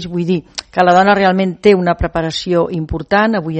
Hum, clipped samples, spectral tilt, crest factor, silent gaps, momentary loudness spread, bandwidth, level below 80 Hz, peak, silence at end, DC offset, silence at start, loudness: none; under 0.1%; -6 dB/octave; 14 dB; none; 9 LU; 8.6 kHz; -34 dBFS; 0 dBFS; 0 s; under 0.1%; 0 s; -14 LUFS